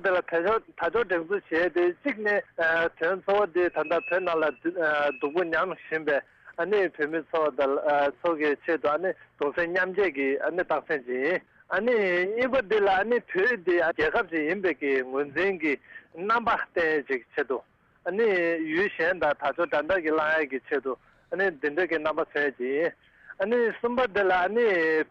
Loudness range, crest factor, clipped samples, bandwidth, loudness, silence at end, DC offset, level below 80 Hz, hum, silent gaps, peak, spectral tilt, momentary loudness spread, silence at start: 2 LU; 10 dB; under 0.1%; 7.2 kHz; -26 LUFS; 0.05 s; under 0.1%; -62 dBFS; none; none; -16 dBFS; -6.5 dB/octave; 6 LU; 0 s